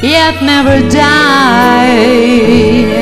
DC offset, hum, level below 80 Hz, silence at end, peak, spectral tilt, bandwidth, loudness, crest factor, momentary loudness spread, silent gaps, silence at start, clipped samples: under 0.1%; none; -32 dBFS; 0 s; 0 dBFS; -5 dB/octave; 15.5 kHz; -7 LUFS; 6 dB; 2 LU; none; 0 s; 2%